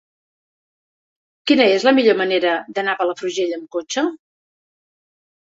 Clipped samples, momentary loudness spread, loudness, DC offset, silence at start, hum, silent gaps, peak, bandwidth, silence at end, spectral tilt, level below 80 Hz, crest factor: under 0.1%; 11 LU; -18 LUFS; under 0.1%; 1.45 s; none; none; -2 dBFS; 8 kHz; 1.35 s; -3.5 dB/octave; -68 dBFS; 20 dB